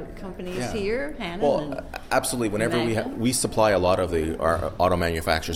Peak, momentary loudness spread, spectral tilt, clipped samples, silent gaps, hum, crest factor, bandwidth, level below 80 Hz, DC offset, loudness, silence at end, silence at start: -6 dBFS; 10 LU; -4.5 dB/octave; under 0.1%; none; none; 18 dB; 16 kHz; -40 dBFS; under 0.1%; -24 LUFS; 0 s; 0 s